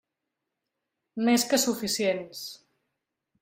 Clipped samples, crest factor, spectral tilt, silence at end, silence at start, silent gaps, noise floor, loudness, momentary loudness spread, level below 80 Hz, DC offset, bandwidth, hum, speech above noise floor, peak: under 0.1%; 18 dB; -2.5 dB/octave; 0.85 s; 1.15 s; none; -85 dBFS; -26 LUFS; 17 LU; -70 dBFS; under 0.1%; 16 kHz; none; 58 dB; -12 dBFS